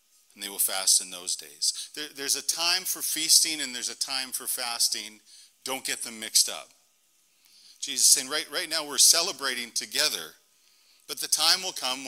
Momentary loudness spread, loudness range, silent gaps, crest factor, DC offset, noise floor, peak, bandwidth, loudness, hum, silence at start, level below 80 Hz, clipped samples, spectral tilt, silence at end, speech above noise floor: 16 LU; 5 LU; none; 24 dB; under 0.1%; -66 dBFS; -4 dBFS; 16 kHz; -24 LUFS; none; 0.35 s; -80 dBFS; under 0.1%; 2 dB/octave; 0 s; 39 dB